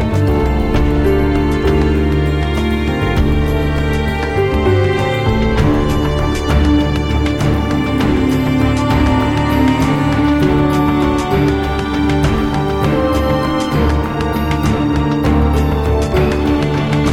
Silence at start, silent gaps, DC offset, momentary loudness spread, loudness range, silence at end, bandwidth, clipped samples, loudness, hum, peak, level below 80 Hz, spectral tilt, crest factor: 0 s; none; under 0.1%; 3 LU; 2 LU; 0 s; 16 kHz; under 0.1%; -15 LUFS; none; -2 dBFS; -20 dBFS; -7 dB/octave; 12 dB